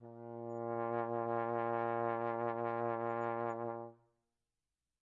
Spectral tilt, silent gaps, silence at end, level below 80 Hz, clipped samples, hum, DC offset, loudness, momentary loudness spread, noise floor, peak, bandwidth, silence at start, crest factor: -9.5 dB/octave; none; 1.1 s; -88 dBFS; under 0.1%; none; under 0.1%; -39 LUFS; 9 LU; under -90 dBFS; -24 dBFS; 7.2 kHz; 0 s; 16 dB